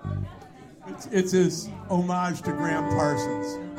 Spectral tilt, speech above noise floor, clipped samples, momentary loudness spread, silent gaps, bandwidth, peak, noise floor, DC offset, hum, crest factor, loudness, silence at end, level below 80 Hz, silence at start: -6 dB/octave; 21 dB; under 0.1%; 17 LU; none; 16 kHz; -10 dBFS; -46 dBFS; under 0.1%; none; 16 dB; -26 LUFS; 0 s; -52 dBFS; 0 s